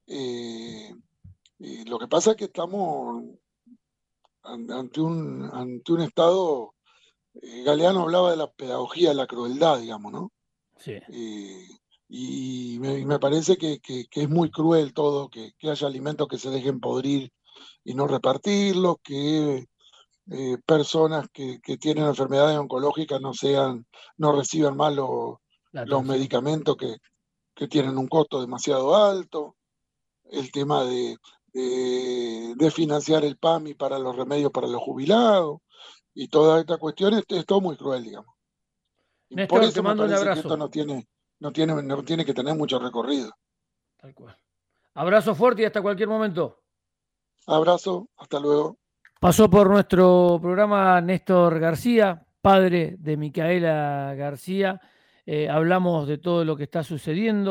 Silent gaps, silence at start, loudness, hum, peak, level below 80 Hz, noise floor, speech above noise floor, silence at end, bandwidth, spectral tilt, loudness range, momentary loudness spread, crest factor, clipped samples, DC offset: none; 0.1 s; -23 LUFS; none; -6 dBFS; -58 dBFS; -83 dBFS; 61 dB; 0 s; 16 kHz; -6 dB/octave; 9 LU; 17 LU; 18 dB; under 0.1%; under 0.1%